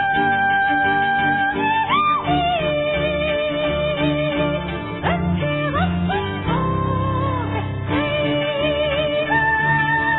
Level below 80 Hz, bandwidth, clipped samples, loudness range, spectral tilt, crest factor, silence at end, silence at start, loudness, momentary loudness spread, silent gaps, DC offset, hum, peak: -38 dBFS; 4.1 kHz; under 0.1%; 3 LU; -9.5 dB/octave; 12 dB; 0 s; 0 s; -19 LUFS; 5 LU; none; under 0.1%; none; -6 dBFS